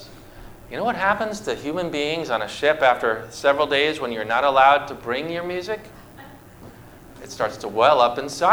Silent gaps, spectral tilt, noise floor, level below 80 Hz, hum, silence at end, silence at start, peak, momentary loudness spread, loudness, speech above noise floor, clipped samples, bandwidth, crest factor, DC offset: none; -4 dB/octave; -44 dBFS; -52 dBFS; none; 0 s; 0 s; -2 dBFS; 11 LU; -21 LUFS; 23 dB; under 0.1%; over 20 kHz; 20 dB; under 0.1%